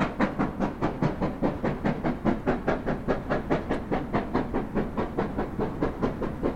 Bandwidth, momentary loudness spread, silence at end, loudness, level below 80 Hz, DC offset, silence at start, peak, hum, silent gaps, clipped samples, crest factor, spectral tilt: 12.5 kHz; 3 LU; 0 s; -29 LUFS; -38 dBFS; 0.3%; 0 s; -10 dBFS; none; none; under 0.1%; 18 dB; -8 dB/octave